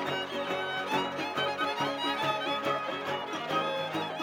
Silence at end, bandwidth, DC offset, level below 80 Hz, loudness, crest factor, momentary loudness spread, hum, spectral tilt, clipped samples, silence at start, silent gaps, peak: 0 s; 17 kHz; under 0.1%; -78 dBFS; -31 LUFS; 16 dB; 3 LU; none; -4 dB/octave; under 0.1%; 0 s; none; -16 dBFS